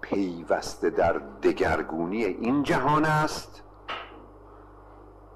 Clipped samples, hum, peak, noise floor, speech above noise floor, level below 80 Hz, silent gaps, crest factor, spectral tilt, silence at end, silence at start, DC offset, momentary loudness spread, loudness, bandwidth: under 0.1%; 50 Hz at -50 dBFS; -12 dBFS; -49 dBFS; 23 dB; -50 dBFS; none; 16 dB; -6 dB/octave; 0 s; 0 s; under 0.1%; 15 LU; -27 LUFS; 13 kHz